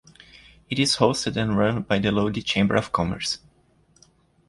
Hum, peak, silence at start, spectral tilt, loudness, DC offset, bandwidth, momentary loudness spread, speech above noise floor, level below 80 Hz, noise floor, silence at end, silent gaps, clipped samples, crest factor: none; -4 dBFS; 0.7 s; -5 dB/octave; -23 LUFS; under 0.1%; 11.5 kHz; 8 LU; 38 dB; -48 dBFS; -60 dBFS; 1.1 s; none; under 0.1%; 20 dB